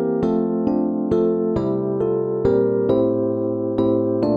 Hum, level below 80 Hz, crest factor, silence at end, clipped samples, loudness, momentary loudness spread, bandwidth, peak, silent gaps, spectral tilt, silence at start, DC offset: none; -46 dBFS; 14 dB; 0 s; under 0.1%; -20 LUFS; 3 LU; 5.2 kHz; -6 dBFS; none; -10.5 dB/octave; 0 s; under 0.1%